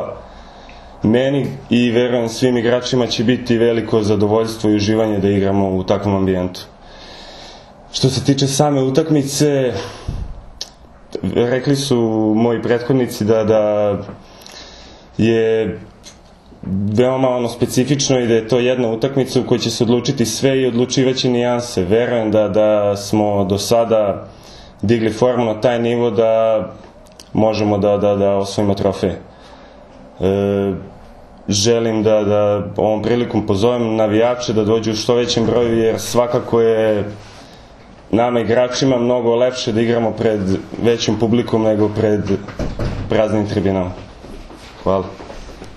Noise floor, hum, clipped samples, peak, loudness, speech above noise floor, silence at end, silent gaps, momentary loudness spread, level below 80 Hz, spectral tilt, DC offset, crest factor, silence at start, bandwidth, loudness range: -43 dBFS; none; under 0.1%; 0 dBFS; -16 LUFS; 27 dB; 0 s; none; 14 LU; -42 dBFS; -5.5 dB/octave; under 0.1%; 16 dB; 0 s; 13 kHz; 3 LU